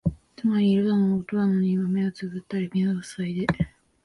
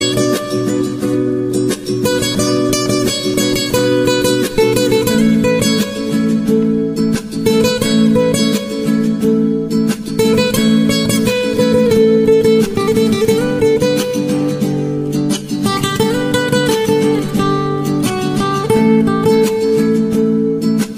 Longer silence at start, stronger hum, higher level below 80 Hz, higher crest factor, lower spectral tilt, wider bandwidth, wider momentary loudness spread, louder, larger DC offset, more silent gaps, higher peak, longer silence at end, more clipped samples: about the same, 0.05 s vs 0 s; neither; second, -50 dBFS vs -40 dBFS; first, 18 dB vs 12 dB; first, -8 dB/octave vs -5 dB/octave; second, 11.5 kHz vs 16 kHz; first, 10 LU vs 5 LU; second, -25 LUFS vs -14 LUFS; neither; neither; second, -6 dBFS vs 0 dBFS; first, 0.35 s vs 0 s; neither